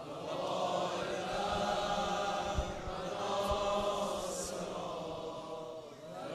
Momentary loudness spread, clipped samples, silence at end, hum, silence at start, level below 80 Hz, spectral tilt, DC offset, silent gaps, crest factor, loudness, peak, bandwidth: 10 LU; under 0.1%; 0 s; none; 0 s; -52 dBFS; -4 dB/octave; under 0.1%; none; 16 dB; -37 LUFS; -20 dBFS; 13.5 kHz